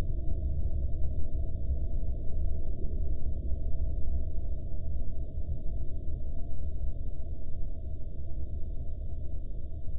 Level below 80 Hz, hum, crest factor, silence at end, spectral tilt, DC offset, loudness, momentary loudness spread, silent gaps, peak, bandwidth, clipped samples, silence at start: -32 dBFS; none; 10 dB; 0 s; -13 dB/octave; under 0.1%; -38 LUFS; 6 LU; none; -16 dBFS; 0.7 kHz; under 0.1%; 0 s